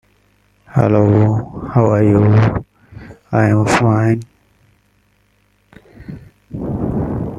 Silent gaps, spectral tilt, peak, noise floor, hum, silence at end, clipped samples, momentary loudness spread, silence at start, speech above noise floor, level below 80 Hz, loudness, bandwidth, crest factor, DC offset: none; -8 dB/octave; 0 dBFS; -58 dBFS; 50 Hz at -45 dBFS; 0 s; under 0.1%; 18 LU; 0.75 s; 46 dB; -40 dBFS; -15 LUFS; 10.5 kHz; 16 dB; under 0.1%